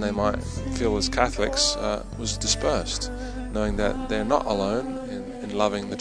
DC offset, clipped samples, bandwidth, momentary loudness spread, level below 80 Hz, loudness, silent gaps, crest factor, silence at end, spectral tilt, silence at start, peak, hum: under 0.1%; under 0.1%; 10.5 kHz; 10 LU; -36 dBFS; -26 LUFS; none; 22 dB; 0 s; -3.5 dB/octave; 0 s; -4 dBFS; none